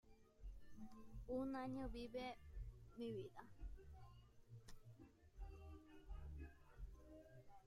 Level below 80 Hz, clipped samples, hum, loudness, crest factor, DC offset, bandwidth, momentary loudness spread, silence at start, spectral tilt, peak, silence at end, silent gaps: -60 dBFS; under 0.1%; none; -55 LUFS; 18 dB; under 0.1%; 15.5 kHz; 17 LU; 0.05 s; -7 dB/octave; -36 dBFS; 0 s; none